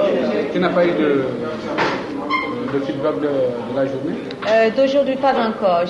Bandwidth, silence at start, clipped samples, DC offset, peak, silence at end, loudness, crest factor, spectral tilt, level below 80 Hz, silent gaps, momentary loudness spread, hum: 9 kHz; 0 s; under 0.1%; under 0.1%; -6 dBFS; 0 s; -19 LUFS; 14 dB; -6.5 dB/octave; -54 dBFS; none; 7 LU; none